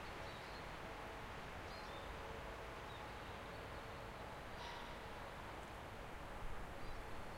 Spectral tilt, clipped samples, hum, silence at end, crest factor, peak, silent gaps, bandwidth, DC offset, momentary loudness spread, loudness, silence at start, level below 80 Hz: -4.5 dB/octave; under 0.1%; none; 0 s; 14 dB; -36 dBFS; none; 16 kHz; under 0.1%; 2 LU; -51 LUFS; 0 s; -58 dBFS